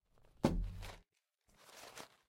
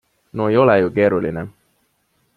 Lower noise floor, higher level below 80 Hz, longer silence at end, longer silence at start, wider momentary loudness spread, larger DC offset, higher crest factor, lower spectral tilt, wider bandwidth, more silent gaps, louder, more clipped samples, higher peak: first, -79 dBFS vs -65 dBFS; about the same, -50 dBFS vs -54 dBFS; second, 0.2 s vs 0.85 s; about the same, 0.45 s vs 0.35 s; about the same, 20 LU vs 18 LU; neither; first, 28 dB vs 18 dB; second, -6 dB/octave vs -9 dB/octave; first, 16 kHz vs 4.7 kHz; neither; second, -41 LUFS vs -17 LUFS; neither; second, -16 dBFS vs 0 dBFS